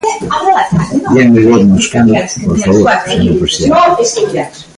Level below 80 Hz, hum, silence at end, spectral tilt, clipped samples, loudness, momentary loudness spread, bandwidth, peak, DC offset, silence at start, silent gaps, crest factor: -32 dBFS; none; 0.15 s; -5 dB/octave; under 0.1%; -9 LUFS; 7 LU; 11.5 kHz; 0 dBFS; under 0.1%; 0.05 s; none; 10 dB